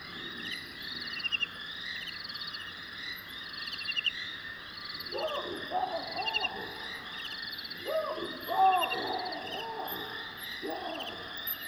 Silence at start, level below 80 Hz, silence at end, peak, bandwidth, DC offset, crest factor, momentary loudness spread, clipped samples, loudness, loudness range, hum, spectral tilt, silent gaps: 0 s; -66 dBFS; 0 s; -16 dBFS; over 20 kHz; under 0.1%; 20 dB; 8 LU; under 0.1%; -34 LUFS; 4 LU; none; -2.5 dB/octave; none